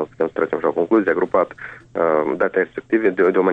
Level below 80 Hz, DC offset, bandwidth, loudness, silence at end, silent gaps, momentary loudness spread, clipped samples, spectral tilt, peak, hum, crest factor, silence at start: -58 dBFS; under 0.1%; 4.6 kHz; -19 LUFS; 0 s; none; 6 LU; under 0.1%; -8.5 dB/octave; -6 dBFS; none; 14 dB; 0 s